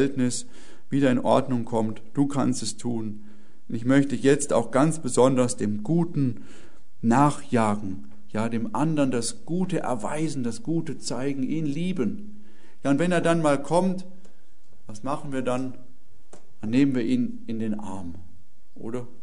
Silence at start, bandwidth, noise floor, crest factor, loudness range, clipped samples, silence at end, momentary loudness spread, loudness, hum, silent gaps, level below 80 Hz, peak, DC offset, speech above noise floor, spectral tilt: 0 s; 11 kHz; -61 dBFS; 20 dB; 5 LU; under 0.1%; 0.15 s; 14 LU; -25 LUFS; none; none; -60 dBFS; -6 dBFS; 3%; 36 dB; -6 dB/octave